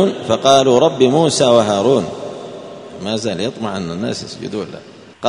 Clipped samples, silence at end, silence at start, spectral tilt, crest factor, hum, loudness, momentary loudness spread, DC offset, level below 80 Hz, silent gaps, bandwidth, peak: under 0.1%; 0 s; 0 s; -5 dB/octave; 16 dB; none; -15 LUFS; 19 LU; under 0.1%; -54 dBFS; none; 11 kHz; 0 dBFS